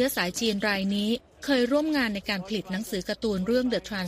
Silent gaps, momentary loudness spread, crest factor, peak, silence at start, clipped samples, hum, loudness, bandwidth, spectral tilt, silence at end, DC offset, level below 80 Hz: none; 7 LU; 16 dB; -10 dBFS; 0 s; under 0.1%; none; -27 LUFS; 15.5 kHz; -4.5 dB/octave; 0 s; under 0.1%; -54 dBFS